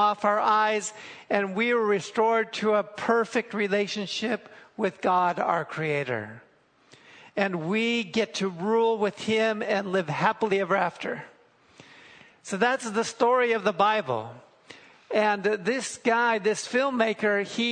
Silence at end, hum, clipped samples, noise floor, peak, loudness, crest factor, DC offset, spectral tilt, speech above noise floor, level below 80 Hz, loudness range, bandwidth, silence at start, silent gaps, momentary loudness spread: 0 s; none; under 0.1%; -58 dBFS; -6 dBFS; -26 LUFS; 20 dB; under 0.1%; -4.5 dB/octave; 33 dB; -74 dBFS; 3 LU; 9.6 kHz; 0 s; none; 9 LU